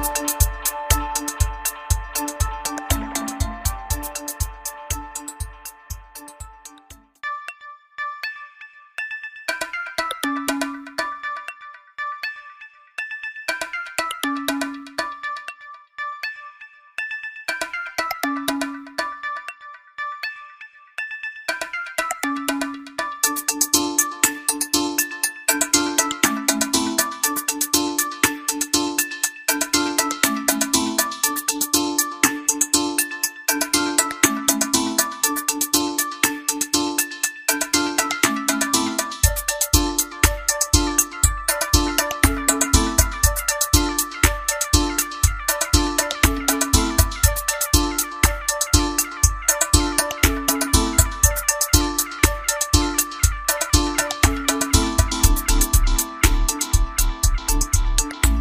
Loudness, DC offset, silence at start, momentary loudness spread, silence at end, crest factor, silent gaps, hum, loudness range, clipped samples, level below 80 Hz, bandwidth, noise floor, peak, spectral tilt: -20 LUFS; under 0.1%; 0 s; 13 LU; 0 s; 22 dB; none; none; 10 LU; under 0.1%; -28 dBFS; 16.5 kHz; -47 dBFS; 0 dBFS; -2.5 dB/octave